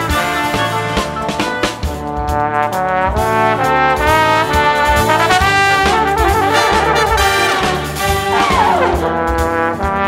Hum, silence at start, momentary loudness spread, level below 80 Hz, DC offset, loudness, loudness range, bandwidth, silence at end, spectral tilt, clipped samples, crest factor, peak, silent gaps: none; 0 s; 7 LU; -26 dBFS; under 0.1%; -13 LUFS; 4 LU; 16.5 kHz; 0 s; -4 dB/octave; under 0.1%; 14 dB; 0 dBFS; none